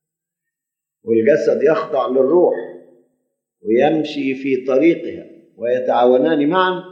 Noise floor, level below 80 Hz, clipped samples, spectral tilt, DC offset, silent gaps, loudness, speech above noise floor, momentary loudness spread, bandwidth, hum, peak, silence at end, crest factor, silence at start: -84 dBFS; -68 dBFS; under 0.1%; -7 dB/octave; under 0.1%; none; -16 LUFS; 68 dB; 12 LU; 7.2 kHz; none; -2 dBFS; 0 s; 16 dB; 1.05 s